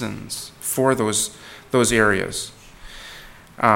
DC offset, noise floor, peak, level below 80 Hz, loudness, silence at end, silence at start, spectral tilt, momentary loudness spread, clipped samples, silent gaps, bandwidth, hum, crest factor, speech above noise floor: under 0.1%; -42 dBFS; 0 dBFS; -46 dBFS; -21 LUFS; 0 s; 0 s; -3.5 dB/octave; 22 LU; under 0.1%; none; 17.5 kHz; none; 22 dB; 20 dB